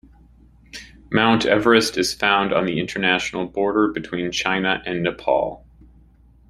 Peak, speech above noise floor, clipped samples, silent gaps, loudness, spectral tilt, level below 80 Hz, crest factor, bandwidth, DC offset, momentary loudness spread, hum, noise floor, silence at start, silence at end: -2 dBFS; 32 dB; under 0.1%; none; -20 LUFS; -4 dB/octave; -50 dBFS; 20 dB; 16 kHz; under 0.1%; 10 LU; none; -51 dBFS; 0.75 s; 0.9 s